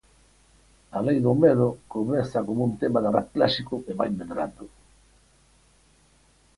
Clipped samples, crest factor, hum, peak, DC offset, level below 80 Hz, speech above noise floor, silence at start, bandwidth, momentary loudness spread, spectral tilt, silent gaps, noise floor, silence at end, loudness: under 0.1%; 20 dB; none; -6 dBFS; under 0.1%; -56 dBFS; 36 dB; 0.95 s; 11.5 kHz; 12 LU; -7.5 dB/octave; none; -60 dBFS; 1.9 s; -25 LUFS